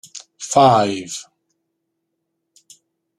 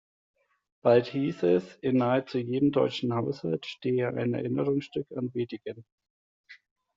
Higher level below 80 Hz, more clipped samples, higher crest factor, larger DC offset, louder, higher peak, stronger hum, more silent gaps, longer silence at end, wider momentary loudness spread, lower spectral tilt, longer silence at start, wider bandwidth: first, -60 dBFS vs -68 dBFS; neither; about the same, 20 dB vs 20 dB; neither; first, -16 LUFS vs -28 LUFS; first, -2 dBFS vs -10 dBFS; neither; second, none vs 5.92-5.98 s, 6.10-6.44 s; first, 1.95 s vs 0.4 s; first, 20 LU vs 10 LU; second, -4.5 dB/octave vs -6 dB/octave; second, 0.15 s vs 0.85 s; first, 13.5 kHz vs 7.6 kHz